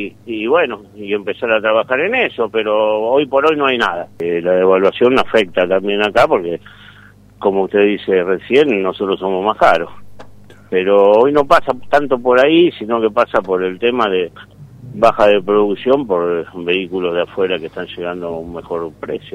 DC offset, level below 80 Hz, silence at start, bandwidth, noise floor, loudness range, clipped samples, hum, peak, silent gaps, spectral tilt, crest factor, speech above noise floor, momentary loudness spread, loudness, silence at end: under 0.1%; -48 dBFS; 0 s; 11.5 kHz; -43 dBFS; 3 LU; under 0.1%; none; 0 dBFS; none; -6 dB/octave; 14 dB; 29 dB; 12 LU; -15 LUFS; 0.05 s